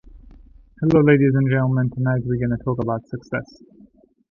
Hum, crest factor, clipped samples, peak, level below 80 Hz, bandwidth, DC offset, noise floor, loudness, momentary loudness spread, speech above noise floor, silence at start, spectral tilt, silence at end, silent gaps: none; 18 dB; under 0.1%; -4 dBFS; -46 dBFS; 6.6 kHz; under 0.1%; -52 dBFS; -20 LUFS; 13 LU; 33 dB; 0.05 s; -10 dB/octave; 0.85 s; none